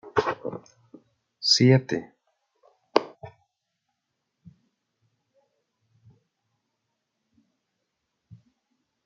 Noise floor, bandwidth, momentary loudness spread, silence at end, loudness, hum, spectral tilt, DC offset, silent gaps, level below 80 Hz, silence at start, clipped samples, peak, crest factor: -80 dBFS; 7.8 kHz; 20 LU; 5.75 s; -23 LUFS; none; -5 dB/octave; under 0.1%; none; -70 dBFS; 0.05 s; under 0.1%; -2 dBFS; 28 dB